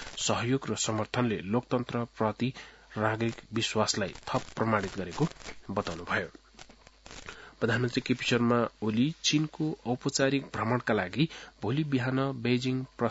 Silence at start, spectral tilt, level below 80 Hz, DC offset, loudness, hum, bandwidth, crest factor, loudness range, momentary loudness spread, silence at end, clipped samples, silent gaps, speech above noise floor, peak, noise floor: 0 s; -4.5 dB/octave; -58 dBFS; under 0.1%; -30 LUFS; none; 8 kHz; 22 dB; 5 LU; 7 LU; 0 s; under 0.1%; none; 24 dB; -10 dBFS; -54 dBFS